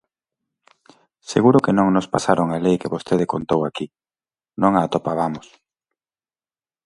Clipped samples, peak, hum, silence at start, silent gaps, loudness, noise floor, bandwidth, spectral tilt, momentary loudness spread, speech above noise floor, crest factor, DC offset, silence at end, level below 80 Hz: under 0.1%; -2 dBFS; none; 1.3 s; none; -19 LUFS; under -90 dBFS; 11.5 kHz; -6.5 dB/octave; 11 LU; over 71 dB; 20 dB; under 0.1%; 1.45 s; -56 dBFS